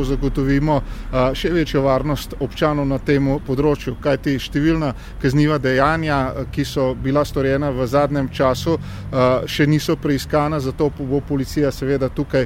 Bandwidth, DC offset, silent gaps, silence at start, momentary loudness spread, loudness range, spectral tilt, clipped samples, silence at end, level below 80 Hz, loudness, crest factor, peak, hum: 16.5 kHz; under 0.1%; none; 0 s; 5 LU; 1 LU; -6.5 dB/octave; under 0.1%; 0 s; -32 dBFS; -19 LUFS; 18 dB; -2 dBFS; none